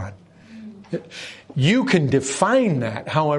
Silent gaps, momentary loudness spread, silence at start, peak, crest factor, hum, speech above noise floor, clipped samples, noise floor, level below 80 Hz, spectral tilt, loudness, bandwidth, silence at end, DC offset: none; 20 LU; 0 s; -2 dBFS; 20 dB; none; 23 dB; under 0.1%; -43 dBFS; -58 dBFS; -5.5 dB/octave; -20 LUFS; 11.5 kHz; 0 s; under 0.1%